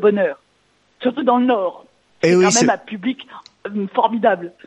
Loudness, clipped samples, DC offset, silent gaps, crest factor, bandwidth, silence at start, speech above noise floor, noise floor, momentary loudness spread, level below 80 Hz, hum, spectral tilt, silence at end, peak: -18 LUFS; under 0.1%; under 0.1%; none; 18 dB; 11.5 kHz; 0 s; 43 dB; -60 dBFS; 15 LU; -68 dBFS; none; -4 dB/octave; 0.2 s; -2 dBFS